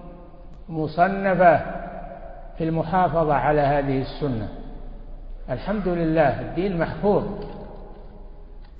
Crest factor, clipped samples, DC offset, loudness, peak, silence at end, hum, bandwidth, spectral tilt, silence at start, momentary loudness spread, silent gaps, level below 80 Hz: 20 dB; under 0.1%; under 0.1%; -22 LUFS; -4 dBFS; 0 s; none; 5.2 kHz; -11.5 dB/octave; 0 s; 23 LU; none; -38 dBFS